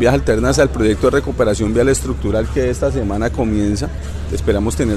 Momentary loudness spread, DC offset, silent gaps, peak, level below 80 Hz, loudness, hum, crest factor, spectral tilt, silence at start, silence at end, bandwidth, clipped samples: 6 LU; under 0.1%; none; -2 dBFS; -24 dBFS; -17 LUFS; none; 14 dB; -6 dB/octave; 0 s; 0 s; 13.5 kHz; under 0.1%